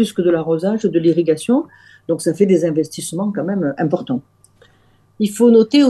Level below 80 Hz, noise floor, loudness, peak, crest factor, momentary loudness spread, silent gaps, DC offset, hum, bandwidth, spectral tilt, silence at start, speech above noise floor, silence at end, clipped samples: -62 dBFS; -54 dBFS; -17 LUFS; -2 dBFS; 14 dB; 11 LU; none; under 0.1%; none; 12.5 kHz; -6 dB/octave; 0 s; 38 dB; 0 s; under 0.1%